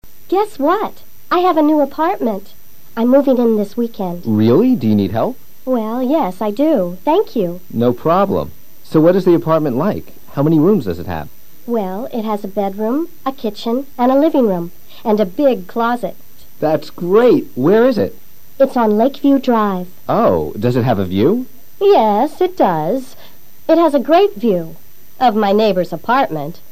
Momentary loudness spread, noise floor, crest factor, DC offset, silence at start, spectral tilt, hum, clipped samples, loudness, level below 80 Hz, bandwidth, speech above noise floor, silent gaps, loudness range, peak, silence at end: 11 LU; -44 dBFS; 14 dB; 4%; 0 s; -8 dB/octave; none; under 0.1%; -15 LUFS; -50 dBFS; 15.5 kHz; 29 dB; none; 3 LU; 0 dBFS; 0.2 s